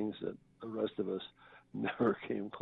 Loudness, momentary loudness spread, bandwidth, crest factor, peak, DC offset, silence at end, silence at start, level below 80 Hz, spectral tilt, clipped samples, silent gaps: -38 LUFS; 14 LU; 4.7 kHz; 18 dB; -20 dBFS; under 0.1%; 0 s; 0 s; -72 dBFS; -9 dB/octave; under 0.1%; none